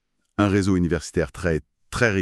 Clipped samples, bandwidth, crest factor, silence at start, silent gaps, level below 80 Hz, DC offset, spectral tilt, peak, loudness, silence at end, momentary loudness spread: under 0.1%; 12.5 kHz; 18 dB; 0.4 s; none; -40 dBFS; under 0.1%; -6 dB/octave; -4 dBFS; -23 LUFS; 0 s; 9 LU